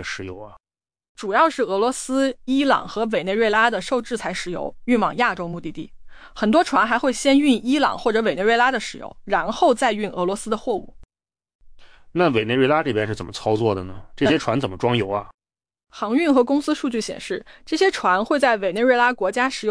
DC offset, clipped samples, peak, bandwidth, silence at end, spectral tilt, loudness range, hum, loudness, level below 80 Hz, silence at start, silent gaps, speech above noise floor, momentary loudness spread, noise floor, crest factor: under 0.1%; under 0.1%; -6 dBFS; 10.5 kHz; 0 s; -4.5 dB/octave; 4 LU; none; -20 LUFS; -50 dBFS; 0 s; 1.09-1.15 s, 11.55-11.59 s, 15.34-15.38 s; 24 dB; 12 LU; -44 dBFS; 16 dB